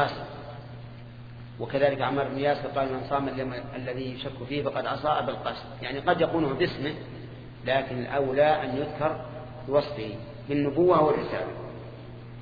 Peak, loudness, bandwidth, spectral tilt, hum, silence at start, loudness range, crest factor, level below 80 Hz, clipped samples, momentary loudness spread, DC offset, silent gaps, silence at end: -8 dBFS; -28 LUFS; 5 kHz; -8.5 dB/octave; none; 0 s; 3 LU; 20 dB; -52 dBFS; under 0.1%; 19 LU; under 0.1%; none; 0 s